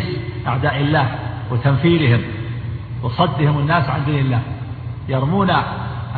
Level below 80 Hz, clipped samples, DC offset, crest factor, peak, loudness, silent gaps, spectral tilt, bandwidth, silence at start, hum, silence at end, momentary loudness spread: -40 dBFS; under 0.1%; under 0.1%; 16 dB; -4 dBFS; -19 LUFS; none; -10.5 dB/octave; 4.7 kHz; 0 s; none; 0 s; 11 LU